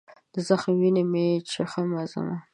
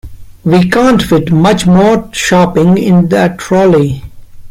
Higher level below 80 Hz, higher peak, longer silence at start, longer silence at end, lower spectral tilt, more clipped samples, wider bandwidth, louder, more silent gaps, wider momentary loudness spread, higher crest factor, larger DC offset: second, -70 dBFS vs -34 dBFS; second, -6 dBFS vs 0 dBFS; first, 0.35 s vs 0.05 s; about the same, 0.1 s vs 0 s; about the same, -6.5 dB/octave vs -6.5 dB/octave; neither; second, 10.5 kHz vs 15.5 kHz; second, -25 LUFS vs -9 LUFS; neither; first, 10 LU vs 4 LU; first, 20 dB vs 8 dB; neither